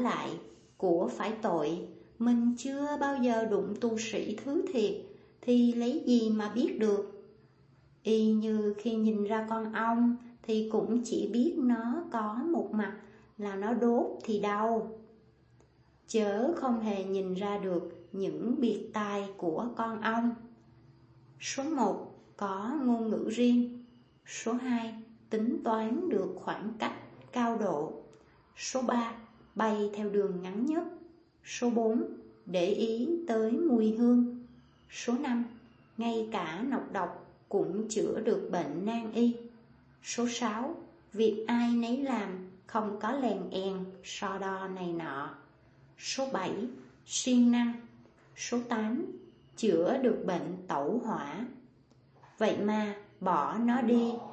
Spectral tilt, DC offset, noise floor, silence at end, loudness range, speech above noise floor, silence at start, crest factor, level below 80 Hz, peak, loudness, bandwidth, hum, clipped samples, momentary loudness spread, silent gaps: -5 dB/octave; under 0.1%; -63 dBFS; 0 s; 4 LU; 33 dB; 0 s; 18 dB; -72 dBFS; -14 dBFS; -32 LUFS; 8.6 kHz; none; under 0.1%; 13 LU; none